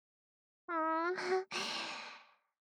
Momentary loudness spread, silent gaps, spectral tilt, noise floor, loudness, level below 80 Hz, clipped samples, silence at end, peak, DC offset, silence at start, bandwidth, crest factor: 17 LU; none; -2 dB/octave; -59 dBFS; -37 LUFS; under -90 dBFS; under 0.1%; 0.4 s; -24 dBFS; under 0.1%; 0.7 s; 13 kHz; 16 dB